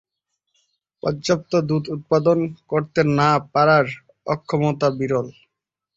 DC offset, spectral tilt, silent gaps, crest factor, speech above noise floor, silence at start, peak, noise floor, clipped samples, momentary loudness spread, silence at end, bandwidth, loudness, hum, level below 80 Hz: under 0.1%; -6.5 dB/octave; none; 18 dB; 62 dB; 1.05 s; -4 dBFS; -81 dBFS; under 0.1%; 10 LU; 0.65 s; 7.8 kHz; -20 LUFS; none; -56 dBFS